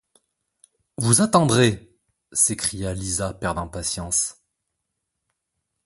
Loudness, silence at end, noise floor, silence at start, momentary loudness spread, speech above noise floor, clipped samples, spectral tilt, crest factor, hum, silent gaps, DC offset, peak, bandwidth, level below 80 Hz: -21 LUFS; 1.55 s; -79 dBFS; 1 s; 12 LU; 58 dB; under 0.1%; -4 dB/octave; 24 dB; none; none; under 0.1%; 0 dBFS; 12 kHz; -46 dBFS